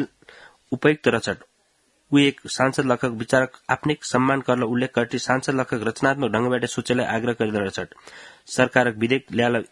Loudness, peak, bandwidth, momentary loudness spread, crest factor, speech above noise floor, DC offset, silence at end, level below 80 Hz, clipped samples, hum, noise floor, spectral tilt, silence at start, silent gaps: -22 LUFS; 0 dBFS; 11.5 kHz; 10 LU; 22 dB; 43 dB; under 0.1%; 0.1 s; -60 dBFS; under 0.1%; none; -65 dBFS; -5 dB/octave; 0 s; none